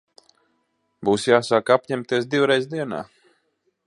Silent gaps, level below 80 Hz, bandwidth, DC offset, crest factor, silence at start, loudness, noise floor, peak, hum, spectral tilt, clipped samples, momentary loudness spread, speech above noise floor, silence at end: none; -64 dBFS; 11.5 kHz; under 0.1%; 22 dB; 1 s; -21 LUFS; -71 dBFS; -2 dBFS; none; -5 dB/octave; under 0.1%; 11 LU; 50 dB; 0.85 s